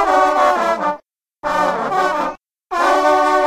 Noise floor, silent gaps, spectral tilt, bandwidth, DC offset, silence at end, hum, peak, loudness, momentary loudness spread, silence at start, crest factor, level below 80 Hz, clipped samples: -41 dBFS; none; -3.5 dB/octave; 14 kHz; under 0.1%; 0 s; none; 0 dBFS; -16 LUFS; 12 LU; 0 s; 16 dB; -50 dBFS; under 0.1%